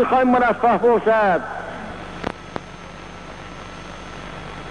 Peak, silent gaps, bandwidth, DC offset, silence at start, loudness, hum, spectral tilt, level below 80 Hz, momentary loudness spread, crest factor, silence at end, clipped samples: -8 dBFS; none; 10.5 kHz; 0.5%; 0 s; -19 LUFS; none; -6 dB/octave; -46 dBFS; 20 LU; 14 dB; 0 s; under 0.1%